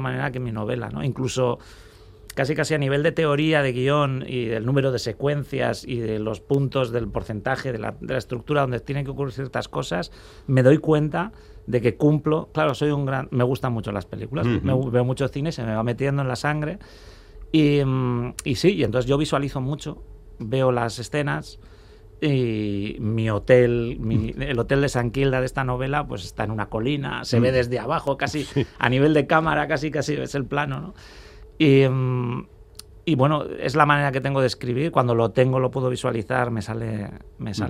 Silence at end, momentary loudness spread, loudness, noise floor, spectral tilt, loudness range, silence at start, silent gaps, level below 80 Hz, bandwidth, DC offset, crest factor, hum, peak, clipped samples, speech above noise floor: 0 s; 10 LU; -23 LUFS; -45 dBFS; -6.5 dB/octave; 4 LU; 0 s; none; -44 dBFS; 14 kHz; under 0.1%; 22 dB; none; 0 dBFS; under 0.1%; 23 dB